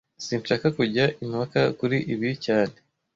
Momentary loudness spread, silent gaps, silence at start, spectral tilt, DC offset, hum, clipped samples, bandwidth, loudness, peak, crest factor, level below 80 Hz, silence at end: 7 LU; none; 0.2 s; -6 dB/octave; under 0.1%; none; under 0.1%; 7.8 kHz; -25 LUFS; -8 dBFS; 18 dB; -60 dBFS; 0.45 s